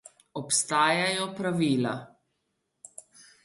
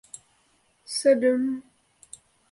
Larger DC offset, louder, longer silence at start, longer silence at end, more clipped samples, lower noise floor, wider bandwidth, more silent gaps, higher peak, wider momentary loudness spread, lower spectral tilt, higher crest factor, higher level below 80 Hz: neither; about the same, -26 LUFS vs -24 LUFS; second, 0.35 s vs 0.9 s; first, 1.35 s vs 0.9 s; neither; first, -78 dBFS vs -66 dBFS; about the same, 11.5 kHz vs 11.5 kHz; neither; about the same, -8 dBFS vs -8 dBFS; second, 23 LU vs 26 LU; about the same, -3.5 dB/octave vs -3 dB/octave; about the same, 20 dB vs 18 dB; about the same, -74 dBFS vs -74 dBFS